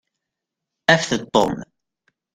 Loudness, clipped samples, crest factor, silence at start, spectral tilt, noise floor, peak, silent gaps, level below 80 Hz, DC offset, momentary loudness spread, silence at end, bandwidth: -19 LUFS; under 0.1%; 22 dB; 0.9 s; -4 dB/octave; -83 dBFS; 0 dBFS; none; -54 dBFS; under 0.1%; 7 LU; 0.7 s; 16 kHz